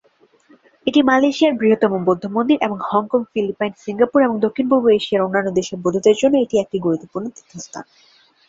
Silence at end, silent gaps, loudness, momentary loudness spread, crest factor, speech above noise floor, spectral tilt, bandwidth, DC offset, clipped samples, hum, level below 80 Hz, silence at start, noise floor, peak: 0.65 s; none; -17 LUFS; 13 LU; 16 dB; 37 dB; -5.5 dB/octave; 7.8 kHz; under 0.1%; under 0.1%; none; -60 dBFS; 0.85 s; -54 dBFS; -2 dBFS